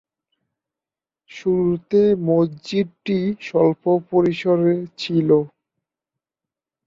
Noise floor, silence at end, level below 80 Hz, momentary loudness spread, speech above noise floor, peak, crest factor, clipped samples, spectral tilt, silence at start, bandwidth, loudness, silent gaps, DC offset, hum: under -90 dBFS; 1.4 s; -58 dBFS; 6 LU; over 71 dB; -4 dBFS; 16 dB; under 0.1%; -8 dB/octave; 1.35 s; 7.4 kHz; -20 LUFS; none; under 0.1%; none